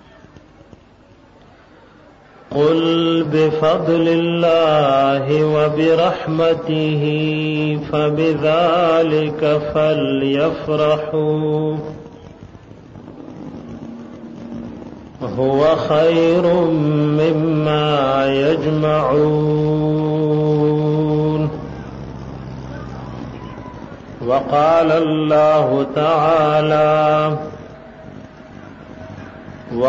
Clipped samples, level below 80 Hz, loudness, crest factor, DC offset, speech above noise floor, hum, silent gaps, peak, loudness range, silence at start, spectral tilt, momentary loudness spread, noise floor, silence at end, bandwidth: under 0.1%; -46 dBFS; -16 LUFS; 12 dB; under 0.1%; 32 dB; none; none; -6 dBFS; 8 LU; 2.5 s; -8 dB/octave; 20 LU; -47 dBFS; 0 s; 7.4 kHz